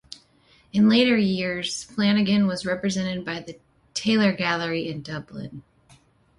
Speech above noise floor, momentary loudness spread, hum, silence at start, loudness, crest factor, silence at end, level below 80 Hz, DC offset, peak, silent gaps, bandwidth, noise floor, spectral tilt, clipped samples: 36 dB; 18 LU; none; 0.75 s; -23 LUFS; 16 dB; 0.8 s; -60 dBFS; under 0.1%; -8 dBFS; none; 11.5 kHz; -59 dBFS; -5 dB/octave; under 0.1%